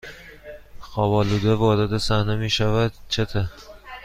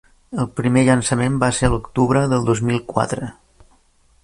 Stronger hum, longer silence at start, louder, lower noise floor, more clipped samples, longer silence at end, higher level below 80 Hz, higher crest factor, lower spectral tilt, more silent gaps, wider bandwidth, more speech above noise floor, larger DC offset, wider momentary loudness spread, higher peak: neither; second, 0.05 s vs 0.3 s; second, -22 LUFS vs -19 LUFS; second, -41 dBFS vs -56 dBFS; neither; second, 0 s vs 0.9 s; about the same, -38 dBFS vs -38 dBFS; about the same, 16 dB vs 18 dB; about the same, -6 dB/octave vs -6 dB/octave; neither; first, 14.5 kHz vs 11.5 kHz; second, 21 dB vs 38 dB; neither; first, 22 LU vs 10 LU; second, -6 dBFS vs 0 dBFS